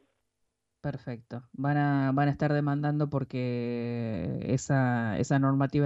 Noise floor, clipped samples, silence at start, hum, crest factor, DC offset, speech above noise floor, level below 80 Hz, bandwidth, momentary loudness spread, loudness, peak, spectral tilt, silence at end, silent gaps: -79 dBFS; under 0.1%; 0.85 s; none; 14 dB; under 0.1%; 51 dB; -60 dBFS; 8 kHz; 12 LU; -29 LUFS; -14 dBFS; -7.5 dB/octave; 0 s; none